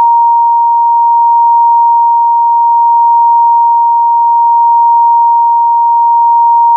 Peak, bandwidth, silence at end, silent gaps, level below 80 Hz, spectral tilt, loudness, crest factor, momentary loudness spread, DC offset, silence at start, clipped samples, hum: -2 dBFS; 1.1 kHz; 0 s; none; under -90 dBFS; 8 dB/octave; -7 LUFS; 4 dB; 1 LU; under 0.1%; 0 s; under 0.1%; none